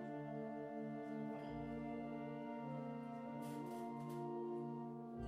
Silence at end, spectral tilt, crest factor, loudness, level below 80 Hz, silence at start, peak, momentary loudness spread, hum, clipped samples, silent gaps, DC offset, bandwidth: 0 s; -8 dB/octave; 12 dB; -48 LUFS; -72 dBFS; 0 s; -36 dBFS; 3 LU; none; under 0.1%; none; under 0.1%; 15.5 kHz